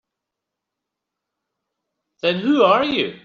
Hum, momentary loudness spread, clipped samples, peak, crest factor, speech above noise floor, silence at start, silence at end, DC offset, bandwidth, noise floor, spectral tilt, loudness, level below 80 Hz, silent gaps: none; 8 LU; under 0.1%; -4 dBFS; 20 dB; 66 dB; 2.25 s; 0.05 s; under 0.1%; 7 kHz; -83 dBFS; -2.5 dB/octave; -18 LUFS; -64 dBFS; none